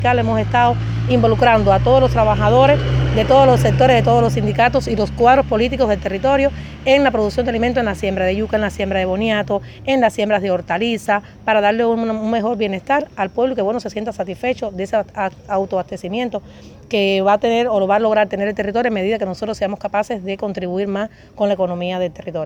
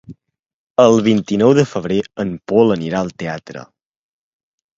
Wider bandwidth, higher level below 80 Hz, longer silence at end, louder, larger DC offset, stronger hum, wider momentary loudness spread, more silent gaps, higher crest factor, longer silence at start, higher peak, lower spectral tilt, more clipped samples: first, 13.5 kHz vs 7.8 kHz; first, -34 dBFS vs -52 dBFS; second, 0 s vs 1.15 s; about the same, -17 LUFS vs -16 LUFS; neither; neither; second, 10 LU vs 14 LU; second, none vs 0.39-0.43 s, 0.54-0.75 s; about the same, 16 dB vs 16 dB; about the same, 0 s vs 0.1 s; about the same, 0 dBFS vs 0 dBFS; about the same, -6.5 dB/octave vs -6.5 dB/octave; neither